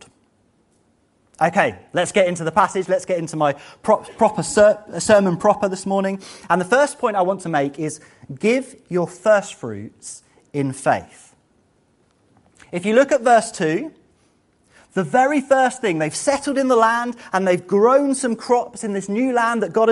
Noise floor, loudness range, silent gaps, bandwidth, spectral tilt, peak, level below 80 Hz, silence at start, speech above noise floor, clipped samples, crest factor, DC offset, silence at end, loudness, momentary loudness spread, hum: -61 dBFS; 5 LU; none; 11.5 kHz; -5 dB/octave; 0 dBFS; -58 dBFS; 1.4 s; 43 dB; under 0.1%; 20 dB; under 0.1%; 0 s; -19 LUFS; 12 LU; none